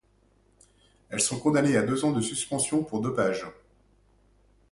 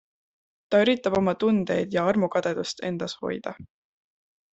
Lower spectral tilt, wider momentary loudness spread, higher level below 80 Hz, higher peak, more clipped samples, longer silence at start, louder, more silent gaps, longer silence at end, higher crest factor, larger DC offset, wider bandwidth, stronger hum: second, -4.5 dB/octave vs -6 dB/octave; about the same, 8 LU vs 10 LU; about the same, -62 dBFS vs -62 dBFS; about the same, -10 dBFS vs -8 dBFS; neither; first, 1.1 s vs 0.7 s; about the same, -26 LUFS vs -25 LUFS; neither; first, 1.2 s vs 0.9 s; about the same, 20 dB vs 18 dB; neither; first, 11.5 kHz vs 8.2 kHz; neither